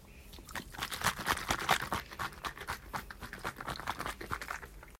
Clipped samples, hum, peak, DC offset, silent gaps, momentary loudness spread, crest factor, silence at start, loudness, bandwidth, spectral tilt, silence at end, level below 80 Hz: under 0.1%; none; -12 dBFS; under 0.1%; none; 13 LU; 26 dB; 0 s; -37 LUFS; 16.5 kHz; -2.5 dB/octave; 0.05 s; -54 dBFS